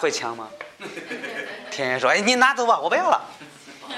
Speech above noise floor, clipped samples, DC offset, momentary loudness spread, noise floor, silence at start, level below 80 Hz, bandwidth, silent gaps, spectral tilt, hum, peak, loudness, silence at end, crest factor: 21 dB; under 0.1%; under 0.1%; 22 LU; -43 dBFS; 0 s; -72 dBFS; 14 kHz; none; -2 dB/octave; none; -4 dBFS; -21 LUFS; 0 s; 20 dB